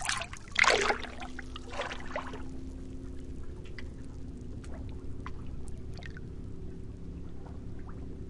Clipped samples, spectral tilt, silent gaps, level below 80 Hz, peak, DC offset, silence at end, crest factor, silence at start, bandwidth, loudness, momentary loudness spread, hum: under 0.1%; -3.5 dB/octave; none; -44 dBFS; -8 dBFS; under 0.1%; 0 s; 28 dB; 0 s; 11.5 kHz; -36 LUFS; 17 LU; none